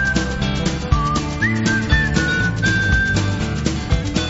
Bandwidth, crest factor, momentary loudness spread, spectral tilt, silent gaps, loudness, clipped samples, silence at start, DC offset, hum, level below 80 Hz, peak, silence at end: 8 kHz; 18 dB; 5 LU; -4.5 dB/octave; none; -18 LUFS; under 0.1%; 0 s; under 0.1%; none; -26 dBFS; 0 dBFS; 0 s